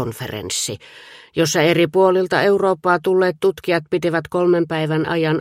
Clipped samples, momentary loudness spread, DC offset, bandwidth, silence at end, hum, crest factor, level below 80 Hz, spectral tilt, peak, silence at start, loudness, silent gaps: under 0.1%; 9 LU; under 0.1%; 16 kHz; 0 s; none; 16 dB; -56 dBFS; -5 dB/octave; -2 dBFS; 0 s; -18 LUFS; none